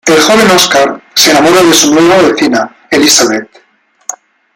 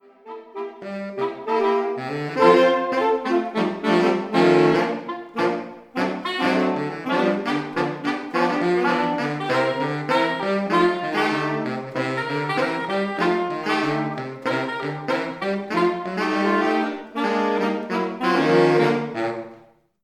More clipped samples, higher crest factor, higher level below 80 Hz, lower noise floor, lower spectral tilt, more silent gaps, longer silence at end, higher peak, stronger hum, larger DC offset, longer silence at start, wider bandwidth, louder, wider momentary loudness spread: first, 0.4% vs under 0.1%; second, 8 dB vs 20 dB; first, -46 dBFS vs -70 dBFS; second, -26 dBFS vs -51 dBFS; second, -2.5 dB/octave vs -6 dB/octave; neither; about the same, 0.4 s vs 0.45 s; about the same, 0 dBFS vs -2 dBFS; neither; neither; second, 0.05 s vs 0.25 s; first, over 20 kHz vs 11.5 kHz; first, -6 LUFS vs -22 LUFS; first, 14 LU vs 10 LU